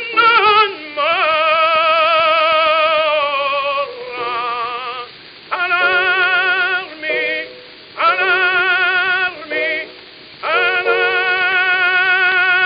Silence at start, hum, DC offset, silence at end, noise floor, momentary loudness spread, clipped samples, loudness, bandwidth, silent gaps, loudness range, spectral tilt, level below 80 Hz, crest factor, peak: 0 s; none; under 0.1%; 0 s; -38 dBFS; 11 LU; under 0.1%; -14 LUFS; 5.6 kHz; none; 4 LU; -6 dB/octave; -60 dBFS; 16 dB; 0 dBFS